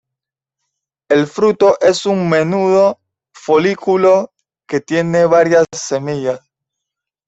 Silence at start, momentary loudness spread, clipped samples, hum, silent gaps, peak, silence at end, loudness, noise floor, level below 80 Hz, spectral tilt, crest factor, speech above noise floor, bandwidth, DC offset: 1.1 s; 11 LU; under 0.1%; none; none; -2 dBFS; 0.9 s; -14 LUFS; -83 dBFS; -58 dBFS; -5.5 dB/octave; 14 dB; 71 dB; 8.2 kHz; under 0.1%